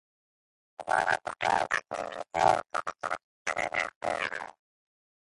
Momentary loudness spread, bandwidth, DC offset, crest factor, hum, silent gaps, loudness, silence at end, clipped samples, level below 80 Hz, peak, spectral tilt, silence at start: 11 LU; 11.5 kHz; under 0.1%; 22 dB; none; 3.24-3.45 s, 3.96-4.01 s; -30 LUFS; 0.8 s; under 0.1%; -64 dBFS; -10 dBFS; -2.5 dB/octave; 0.8 s